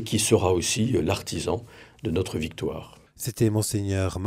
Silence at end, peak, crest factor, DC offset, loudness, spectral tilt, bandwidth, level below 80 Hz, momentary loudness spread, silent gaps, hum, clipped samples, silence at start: 0 s; -6 dBFS; 20 dB; under 0.1%; -26 LUFS; -5 dB/octave; 16 kHz; -52 dBFS; 12 LU; none; none; under 0.1%; 0 s